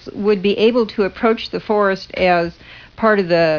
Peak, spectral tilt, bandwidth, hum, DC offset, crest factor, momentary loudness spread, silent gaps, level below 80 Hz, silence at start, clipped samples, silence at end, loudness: -2 dBFS; -7 dB/octave; 5.4 kHz; none; 0.1%; 16 dB; 5 LU; none; -48 dBFS; 0.05 s; under 0.1%; 0 s; -17 LUFS